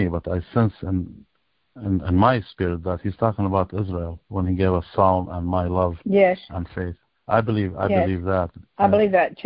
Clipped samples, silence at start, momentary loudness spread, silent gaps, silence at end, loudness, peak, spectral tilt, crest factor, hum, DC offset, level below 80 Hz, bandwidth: under 0.1%; 0 s; 12 LU; none; 0.05 s; -22 LUFS; -4 dBFS; -12.5 dB/octave; 18 dB; none; under 0.1%; -36 dBFS; 5.2 kHz